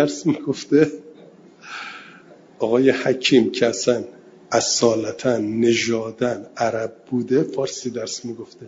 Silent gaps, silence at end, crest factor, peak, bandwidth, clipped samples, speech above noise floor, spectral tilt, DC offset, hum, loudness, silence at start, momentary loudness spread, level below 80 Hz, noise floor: none; 0 s; 18 dB; -2 dBFS; 7.8 kHz; under 0.1%; 26 dB; -4 dB/octave; under 0.1%; none; -20 LUFS; 0 s; 16 LU; -64 dBFS; -47 dBFS